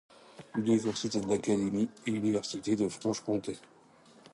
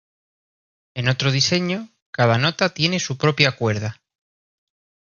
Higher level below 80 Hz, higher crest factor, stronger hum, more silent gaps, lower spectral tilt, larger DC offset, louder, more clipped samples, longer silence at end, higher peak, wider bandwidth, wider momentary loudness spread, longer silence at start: second, -68 dBFS vs -56 dBFS; second, 16 dB vs 22 dB; neither; second, none vs 2.02-2.13 s; about the same, -5.5 dB/octave vs -4.5 dB/octave; neither; second, -32 LUFS vs -20 LUFS; neither; second, 0.75 s vs 1.15 s; second, -16 dBFS vs 0 dBFS; first, 11.5 kHz vs 7.2 kHz; second, 6 LU vs 11 LU; second, 0.35 s vs 0.95 s